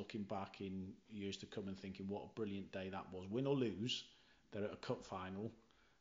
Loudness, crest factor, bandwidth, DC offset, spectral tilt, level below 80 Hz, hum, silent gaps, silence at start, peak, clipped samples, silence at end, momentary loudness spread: -46 LUFS; 18 dB; 7.6 kHz; under 0.1%; -6 dB/octave; -78 dBFS; none; none; 0 s; -28 dBFS; under 0.1%; 0.4 s; 10 LU